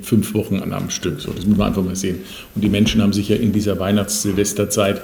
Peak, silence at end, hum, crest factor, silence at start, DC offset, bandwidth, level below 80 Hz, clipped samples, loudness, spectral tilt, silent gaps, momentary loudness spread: -2 dBFS; 0 s; none; 16 dB; 0 s; under 0.1%; over 20 kHz; -38 dBFS; under 0.1%; -19 LUFS; -5 dB/octave; none; 7 LU